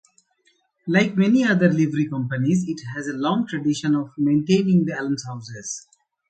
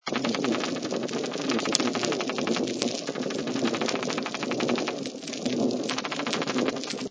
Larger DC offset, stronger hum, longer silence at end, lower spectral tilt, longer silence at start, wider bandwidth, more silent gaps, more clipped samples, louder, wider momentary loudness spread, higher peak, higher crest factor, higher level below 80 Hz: neither; neither; first, 0.5 s vs 0 s; first, -6 dB/octave vs -3.5 dB/octave; first, 0.85 s vs 0.05 s; first, 9 kHz vs 8 kHz; neither; neither; first, -21 LUFS vs -28 LUFS; first, 13 LU vs 5 LU; about the same, -4 dBFS vs -2 dBFS; second, 18 dB vs 26 dB; first, -62 dBFS vs -68 dBFS